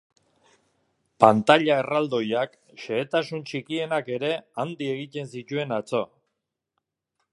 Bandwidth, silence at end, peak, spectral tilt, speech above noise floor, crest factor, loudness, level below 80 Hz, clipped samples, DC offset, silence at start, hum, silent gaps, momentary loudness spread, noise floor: 11.5 kHz; 1.3 s; 0 dBFS; -6 dB/octave; 57 dB; 26 dB; -25 LUFS; -70 dBFS; under 0.1%; under 0.1%; 1.2 s; none; none; 14 LU; -81 dBFS